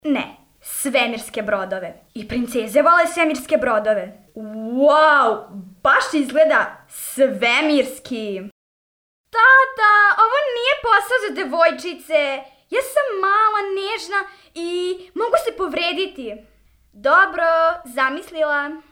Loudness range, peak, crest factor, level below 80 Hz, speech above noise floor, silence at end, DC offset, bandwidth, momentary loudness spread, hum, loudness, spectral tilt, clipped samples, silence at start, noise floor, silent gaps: 5 LU; -4 dBFS; 16 dB; -56 dBFS; over 71 dB; 0.1 s; under 0.1%; 19.5 kHz; 16 LU; none; -18 LUFS; -2.5 dB/octave; under 0.1%; 0.05 s; under -90 dBFS; 8.52-9.24 s